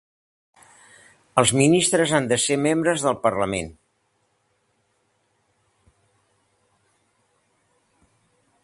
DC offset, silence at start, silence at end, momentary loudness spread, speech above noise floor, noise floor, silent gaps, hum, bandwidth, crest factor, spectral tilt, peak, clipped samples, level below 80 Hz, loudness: under 0.1%; 1.35 s; 4.9 s; 9 LU; 49 dB; -69 dBFS; none; none; 11.5 kHz; 24 dB; -4 dB/octave; 0 dBFS; under 0.1%; -56 dBFS; -20 LUFS